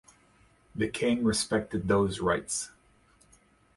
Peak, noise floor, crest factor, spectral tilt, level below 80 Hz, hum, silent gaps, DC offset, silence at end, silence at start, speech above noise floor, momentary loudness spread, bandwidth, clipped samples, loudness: -12 dBFS; -63 dBFS; 18 dB; -4.5 dB/octave; -54 dBFS; none; none; under 0.1%; 1.05 s; 0.75 s; 35 dB; 7 LU; 11.5 kHz; under 0.1%; -29 LUFS